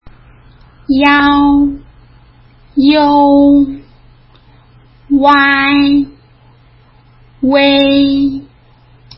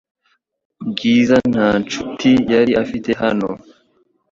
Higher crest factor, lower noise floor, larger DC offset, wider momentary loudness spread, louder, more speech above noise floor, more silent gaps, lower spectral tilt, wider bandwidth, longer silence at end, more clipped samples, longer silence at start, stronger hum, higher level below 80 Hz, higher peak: about the same, 12 dB vs 16 dB; second, -44 dBFS vs -65 dBFS; neither; about the same, 12 LU vs 13 LU; first, -10 LUFS vs -16 LUFS; second, 36 dB vs 49 dB; neither; about the same, -7 dB/octave vs -6 dB/octave; second, 5.8 kHz vs 7.4 kHz; about the same, 0.75 s vs 0.75 s; neither; about the same, 0.9 s vs 0.8 s; neither; first, -38 dBFS vs -48 dBFS; about the same, 0 dBFS vs -2 dBFS